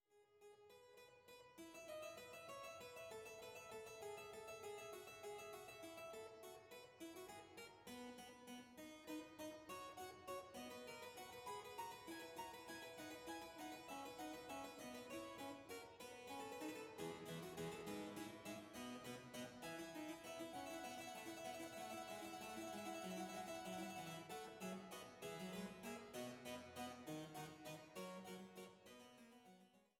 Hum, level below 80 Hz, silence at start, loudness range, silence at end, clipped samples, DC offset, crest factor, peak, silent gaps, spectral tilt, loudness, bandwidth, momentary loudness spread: none; -82 dBFS; 0.1 s; 5 LU; 0.15 s; under 0.1%; under 0.1%; 16 dB; -38 dBFS; none; -3.5 dB/octave; -54 LUFS; 17 kHz; 8 LU